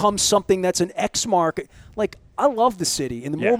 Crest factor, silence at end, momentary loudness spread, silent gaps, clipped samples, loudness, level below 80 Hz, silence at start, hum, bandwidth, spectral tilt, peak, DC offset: 16 dB; 0 s; 9 LU; none; under 0.1%; -21 LUFS; -50 dBFS; 0 s; none; 16.5 kHz; -3.5 dB/octave; -4 dBFS; under 0.1%